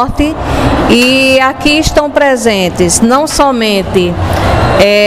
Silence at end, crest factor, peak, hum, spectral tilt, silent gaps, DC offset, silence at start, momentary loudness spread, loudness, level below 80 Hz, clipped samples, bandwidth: 0 s; 8 dB; 0 dBFS; none; -4 dB/octave; none; 0.8%; 0 s; 6 LU; -9 LUFS; -22 dBFS; 0.5%; 16.5 kHz